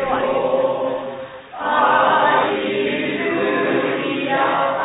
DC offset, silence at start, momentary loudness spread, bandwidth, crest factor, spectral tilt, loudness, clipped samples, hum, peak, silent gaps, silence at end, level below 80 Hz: under 0.1%; 0 s; 11 LU; 4 kHz; 16 dB; -8.5 dB/octave; -18 LUFS; under 0.1%; none; -2 dBFS; none; 0 s; -54 dBFS